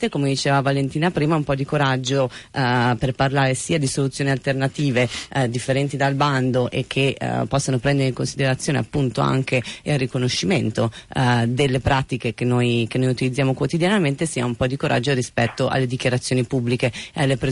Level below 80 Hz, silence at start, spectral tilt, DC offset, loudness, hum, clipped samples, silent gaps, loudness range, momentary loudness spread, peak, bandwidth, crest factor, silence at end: -46 dBFS; 0 s; -5.5 dB/octave; under 0.1%; -21 LUFS; none; under 0.1%; none; 1 LU; 4 LU; -8 dBFS; 11.5 kHz; 14 dB; 0 s